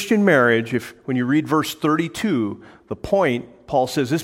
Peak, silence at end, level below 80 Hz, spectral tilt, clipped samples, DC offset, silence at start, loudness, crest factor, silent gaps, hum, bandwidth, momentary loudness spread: -2 dBFS; 0 s; -52 dBFS; -5.5 dB/octave; under 0.1%; under 0.1%; 0 s; -20 LUFS; 18 dB; none; none; 16.5 kHz; 12 LU